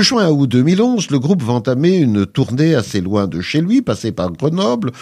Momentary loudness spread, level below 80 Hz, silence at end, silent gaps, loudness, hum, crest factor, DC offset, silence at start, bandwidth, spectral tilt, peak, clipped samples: 5 LU; -50 dBFS; 0 s; none; -15 LUFS; none; 14 dB; under 0.1%; 0 s; 13.5 kHz; -6 dB/octave; -2 dBFS; under 0.1%